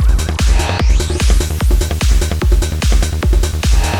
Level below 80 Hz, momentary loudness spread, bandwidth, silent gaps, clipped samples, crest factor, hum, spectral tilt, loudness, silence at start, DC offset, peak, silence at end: -12 dBFS; 1 LU; 16.5 kHz; none; under 0.1%; 12 dB; none; -4.5 dB/octave; -15 LUFS; 0 s; under 0.1%; 0 dBFS; 0 s